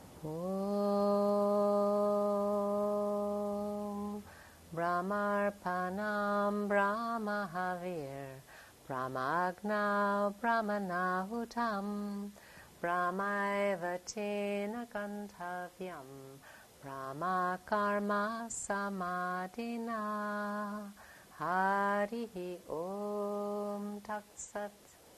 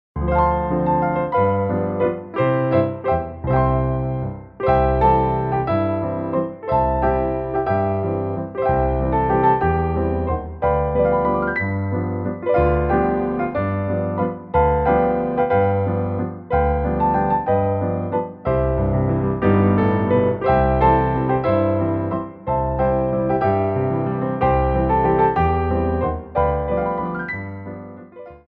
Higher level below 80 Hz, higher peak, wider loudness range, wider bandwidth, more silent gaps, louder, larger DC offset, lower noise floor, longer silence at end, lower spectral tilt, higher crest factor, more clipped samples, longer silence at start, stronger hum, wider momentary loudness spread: second, -70 dBFS vs -32 dBFS; second, -18 dBFS vs -2 dBFS; first, 6 LU vs 2 LU; first, 13.5 kHz vs 5 kHz; neither; second, -35 LUFS vs -20 LUFS; neither; first, -56 dBFS vs -39 dBFS; about the same, 0 s vs 0.1 s; second, -5.5 dB/octave vs -11.5 dB/octave; about the same, 18 dB vs 16 dB; neither; second, 0 s vs 0.15 s; neither; first, 14 LU vs 7 LU